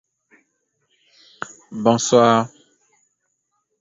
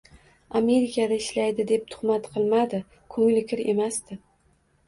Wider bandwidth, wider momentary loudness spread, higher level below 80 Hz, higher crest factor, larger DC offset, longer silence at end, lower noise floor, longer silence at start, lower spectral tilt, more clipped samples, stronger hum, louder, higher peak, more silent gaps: second, 7.8 kHz vs 11.5 kHz; first, 21 LU vs 11 LU; about the same, -64 dBFS vs -62 dBFS; first, 22 dB vs 14 dB; neither; first, 1.35 s vs 0.7 s; first, -72 dBFS vs -64 dBFS; first, 1.4 s vs 0.5 s; about the same, -4.5 dB/octave vs -5 dB/octave; neither; neither; first, -17 LUFS vs -25 LUFS; first, -2 dBFS vs -10 dBFS; neither